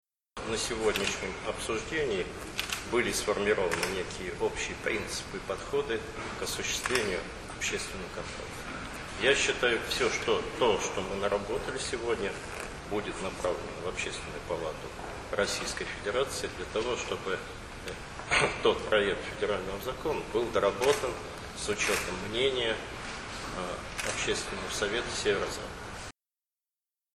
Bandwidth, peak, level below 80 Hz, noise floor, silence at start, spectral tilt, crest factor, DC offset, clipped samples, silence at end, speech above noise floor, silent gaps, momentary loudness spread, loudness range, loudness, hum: 13 kHz; -10 dBFS; -50 dBFS; under -90 dBFS; 0.35 s; -3 dB/octave; 22 dB; under 0.1%; under 0.1%; 1.05 s; over 59 dB; none; 11 LU; 5 LU; -31 LUFS; none